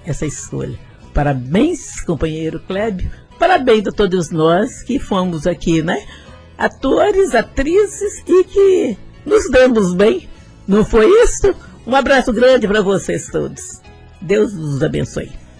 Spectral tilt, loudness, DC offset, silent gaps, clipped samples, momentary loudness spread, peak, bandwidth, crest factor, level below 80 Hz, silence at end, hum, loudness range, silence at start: -5.5 dB/octave; -15 LUFS; under 0.1%; none; under 0.1%; 13 LU; -2 dBFS; 10.5 kHz; 12 dB; -30 dBFS; 0.2 s; none; 4 LU; 0.05 s